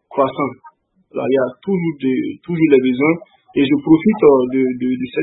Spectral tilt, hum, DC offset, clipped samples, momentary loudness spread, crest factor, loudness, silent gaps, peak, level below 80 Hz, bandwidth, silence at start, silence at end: -11 dB/octave; none; under 0.1%; under 0.1%; 11 LU; 16 dB; -16 LUFS; none; 0 dBFS; -56 dBFS; 4 kHz; 0.1 s; 0 s